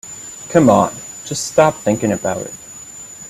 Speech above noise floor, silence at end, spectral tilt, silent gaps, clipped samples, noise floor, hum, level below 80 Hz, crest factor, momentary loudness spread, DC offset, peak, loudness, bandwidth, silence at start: 20 dB; 0 s; -5 dB/octave; none; under 0.1%; -35 dBFS; none; -52 dBFS; 16 dB; 20 LU; under 0.1%; 0 dBFS; -16 LUFS; 15 kHz; 0.05 s